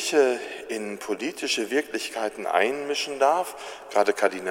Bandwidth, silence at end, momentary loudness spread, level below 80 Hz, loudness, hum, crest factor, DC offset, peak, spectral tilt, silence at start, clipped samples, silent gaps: 16.5 kHz; 0 s; 10 LU; -70 dBFS; -26 LUFS; 50 Hz at -75 dBFS; 20 dB; under 0.1%; -6 dBFS; -2 dB/octave; 0 s; under 0.1%; none